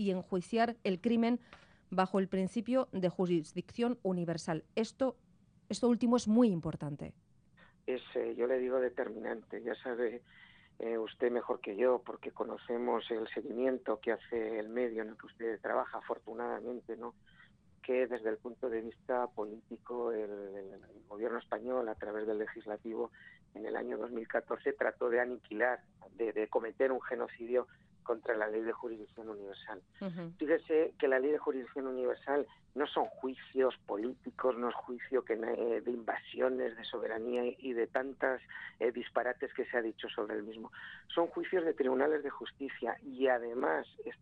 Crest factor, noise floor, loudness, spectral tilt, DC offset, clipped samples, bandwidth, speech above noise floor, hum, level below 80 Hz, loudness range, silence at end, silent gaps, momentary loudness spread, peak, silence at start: 20 dB; -65 dBFS; -36 LUFS; -6.5 dB/octave; under 0.1%; under 0.1%; 10 kHz; 29 dB; none; -74 dBFS; 5 LU; 0.05 s; none; 11 LU; -16 dBFS; 0 s